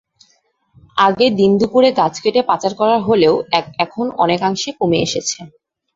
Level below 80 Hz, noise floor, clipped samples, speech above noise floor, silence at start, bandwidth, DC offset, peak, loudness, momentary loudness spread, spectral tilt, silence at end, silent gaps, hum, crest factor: -54 dBFS; -60 dBFS; under 0.1%; 45 dB; 0.95 s; 7.8 kHz; under 0.1%; 0 dBFS; -15 LUFS; 7 LU; -4.5 dB/octave; 0.5 s; none; none; 16 dB